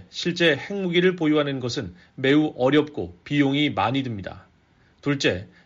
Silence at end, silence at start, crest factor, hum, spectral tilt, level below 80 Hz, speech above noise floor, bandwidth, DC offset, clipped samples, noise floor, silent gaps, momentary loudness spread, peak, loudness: 0.2 s; 0 s; 16 dB; none; -4 dB/octave; -58 dBFS; 36 dB; 7.6 kHz; under 0.1%; under 0.1%; -59 dBFS; none; 12 LU; -6 dBFS; -23 LUFS